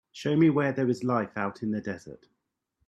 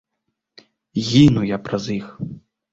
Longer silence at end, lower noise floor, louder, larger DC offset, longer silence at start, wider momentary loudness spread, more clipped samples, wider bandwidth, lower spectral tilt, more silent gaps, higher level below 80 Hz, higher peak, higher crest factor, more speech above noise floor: first, 0.75 s vs 0.35 s; about the same, -77 dBFS vs -77 dBFS; second, -27 LUFS vs -18 LUFS; neither; second, 0.15 s vs 0.95 s; second, 11 LU vs 19 LU; neither; about the same, 8.8 kHz vs 8 kHz; about the same, -7.5 dB/octave vs -6.5 dB/octave; neither; second, -68 dBFS vs -46 dBFS; second, -12 dBFS vs -2 dBFS; about the same, 18 dB vs 20 dB; second, 50 dB vs 59 dB